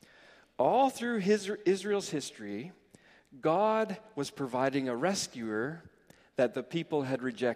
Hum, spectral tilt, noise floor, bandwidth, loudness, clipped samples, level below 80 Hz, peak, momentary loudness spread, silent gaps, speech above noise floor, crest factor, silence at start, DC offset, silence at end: none; -5 dB/octave; -61 dBFS; 15.5 kHz; -32 LUFS; under 0.1%; -76 dBFS; -14 dBFS; 12 LU; none; 30 dB; 18 dB; 0.6 s; under 0.1%; 0 s